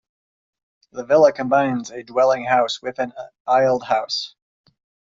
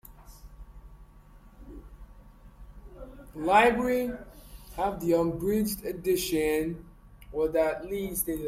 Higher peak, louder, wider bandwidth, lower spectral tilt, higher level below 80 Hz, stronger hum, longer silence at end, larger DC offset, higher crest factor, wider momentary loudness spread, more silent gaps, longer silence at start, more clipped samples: first, -2 dBFS vs -8 dBFS; first, -19 LUFS vs -27 LUFS; second, 7.8 kHz vs 16.5 kHz; second, -2.5 dB/octave vs -4.5 dB/octave; second, -64 dBFS vs -48 dBFS; neither; first, 0.85 s vs 0 s; neither; about the same, 18 dB vs 22 dB; second, 15 LU vs 25 LU; first, 3.40-3.45 s vs none; first, 0.95 s vs 0.1 s; neither